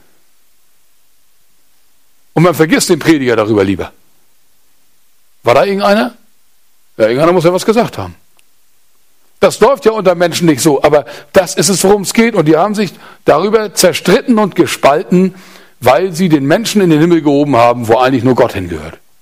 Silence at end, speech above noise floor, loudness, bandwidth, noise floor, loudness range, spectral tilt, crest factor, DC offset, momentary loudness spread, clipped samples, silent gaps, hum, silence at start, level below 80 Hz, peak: 0.3 s; 46 dB; -10 LUFS; 16.5 kHz; -56 dBFS; 4 LU; -5 dB/octave; 12 dB; 0.4%; 8 LU; 0.1%; none; none; 2.35 s; -44 dBFS; 0 dBFS